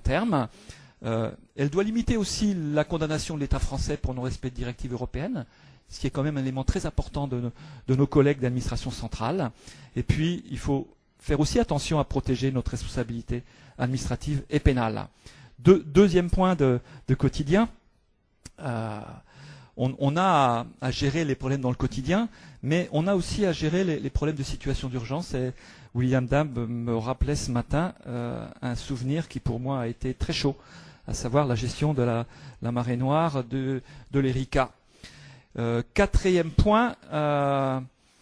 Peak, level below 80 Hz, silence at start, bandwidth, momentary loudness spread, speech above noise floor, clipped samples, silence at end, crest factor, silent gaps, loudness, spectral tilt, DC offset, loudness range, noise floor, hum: -4 dBFS; -38 dBFS; 0 s; 11 kHz; 12 LU; 40 dB; under 0.1%; 0.35 s; 22 dB; none; -27 LUFS; -6.5 dB/octave; under 0.1%; 6 LU; -66 dBFS; none